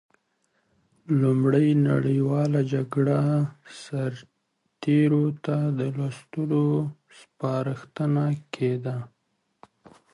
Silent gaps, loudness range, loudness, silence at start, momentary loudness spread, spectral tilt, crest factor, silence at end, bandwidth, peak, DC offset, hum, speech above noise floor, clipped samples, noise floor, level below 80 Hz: none; 4 LU; -25 LUFS; 1.1 s; 12 LU; -9 dB/octave; 16 dB; 1.05 s; 11 kHz; -10 dBFS; under 0.1%; none; 51 dB; under 0.1%; -75 dBFS; -66 dBFS